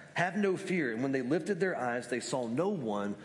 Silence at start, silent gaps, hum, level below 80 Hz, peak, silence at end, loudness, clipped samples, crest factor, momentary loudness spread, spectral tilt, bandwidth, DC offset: 0 s; none; none; -80 dBFS; -16 dBFS; 0 s; -33 LUFS; under 0.1%; 16 dB; 4 LU; -5.5 dB/octave; 11.5 kHz; under 0.1%